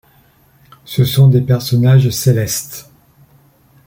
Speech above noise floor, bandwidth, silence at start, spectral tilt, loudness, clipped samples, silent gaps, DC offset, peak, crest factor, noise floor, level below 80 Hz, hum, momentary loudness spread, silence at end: 39 dB; 17 kHz; 0.9 s; -6 dB/octave; -13 LUFS; under 0.1%; none; under 0.1%; -2 dBFS; 12 dB; -51 dBFS; -46 dBFS; none; 12 LU; 1.05 s